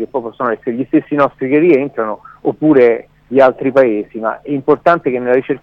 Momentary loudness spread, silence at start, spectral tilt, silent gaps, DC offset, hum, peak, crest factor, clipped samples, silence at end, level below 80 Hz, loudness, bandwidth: 10 LU; 0 s; -9 dB/octave; none; under 0.1%; none; 0 dBFS; 14 dB; under 0.1%; 0.05 s; -54 dBFS; -14 LUFS; 5.8 kHz